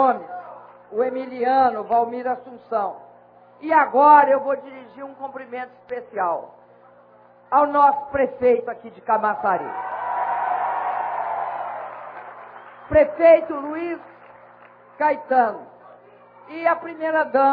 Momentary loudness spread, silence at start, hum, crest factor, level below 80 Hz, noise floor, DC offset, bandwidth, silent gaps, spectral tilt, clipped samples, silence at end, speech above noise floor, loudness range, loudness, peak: 21 LU; 0 s; 60 Hz at -60 dBFS; 20 dB; -56 dBFS; -51 dBFS; under 0.1%; 4.9 kHz; none; -9 dB/octave; under 0.1%; 0 s; 31 dB; 6 LU; -20 LUFS; -2 dBFS